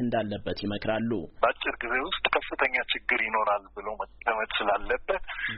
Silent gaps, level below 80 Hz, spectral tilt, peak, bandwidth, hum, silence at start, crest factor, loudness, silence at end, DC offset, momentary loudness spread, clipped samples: none; -50 dBFS; -2 dB/octave; -6 dBFS; 5.4 kHz; none; 0 s; 22 dB; -28 LUFS; 0 s; under 0.1%; 7 LU; under 0.1%